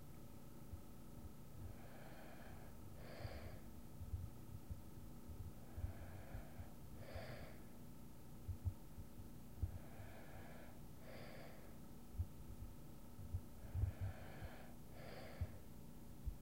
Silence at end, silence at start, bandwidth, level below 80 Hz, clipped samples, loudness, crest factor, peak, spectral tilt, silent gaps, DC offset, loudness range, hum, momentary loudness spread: 0 s; 0 s; 16 kHz; -58 dBFS; under 0.1%; -55 LUFS; 22 dB; -30 dBFS; -6.5 dB/octave; none; 0.2%; 5 LU; none; 9 LU